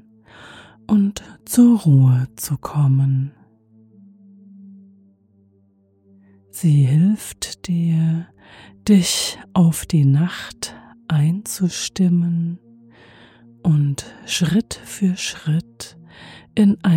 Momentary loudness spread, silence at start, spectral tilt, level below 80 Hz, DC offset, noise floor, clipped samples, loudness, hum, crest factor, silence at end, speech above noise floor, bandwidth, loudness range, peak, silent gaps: 16 LU; 0.45 s; -6 dB/octave; -52 dBFS; under 0.1%; -58 dBFS; under 0.1%; -19 LUFS; none; 16 dB; 0 s; 40 dB; 16.5 kHz; 6 LU; -4 dBFS; none